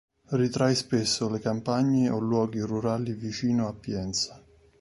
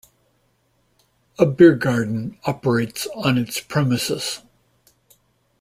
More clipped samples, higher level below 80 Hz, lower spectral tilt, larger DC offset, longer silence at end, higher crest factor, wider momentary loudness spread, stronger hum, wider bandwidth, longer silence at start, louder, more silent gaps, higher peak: neither; about the same, -56 dBFS vs -58 dBFS; about the same, -5.5 dB/octave vs -5.5 dB/octave; neither; second, 0.4 s vs 1.25 s; about the same, 16 dB vs 20 dB; second, 7 LU vs 13 LU; neither; second, 11.5 kHz vs 16 kHz; second, 0.3 s vs 1.4 s; second, -27 LUFS vs -20 LUFS; neither; second, -10 dBFS vs -2 dBFS